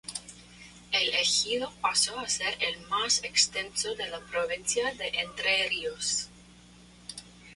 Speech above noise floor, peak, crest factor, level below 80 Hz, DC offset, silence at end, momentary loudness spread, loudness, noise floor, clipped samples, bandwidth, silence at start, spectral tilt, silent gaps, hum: 24 dB; -10 dBFS; 22 dB; -60 dBFS; under 0.1%; 0 s; 19 LU; -27 LUFS; -54 dBFS; under 0.1%; 11.5 kHz; 0.05 s; 0.5 dB/octave; none; 60 Hz at -55 dBFS